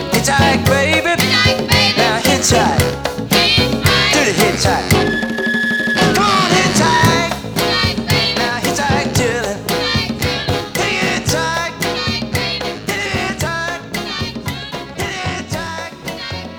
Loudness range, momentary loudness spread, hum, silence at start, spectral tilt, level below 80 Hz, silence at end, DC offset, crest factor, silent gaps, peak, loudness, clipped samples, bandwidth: 8 LU; 11 LU; none; 0 s; -3.5 dB/octave; -34 dBFS; 0 s; under 0.1%; 16 dB; none; 0 dBFS; -15 LUFS; under 0.1%; over 20 kHz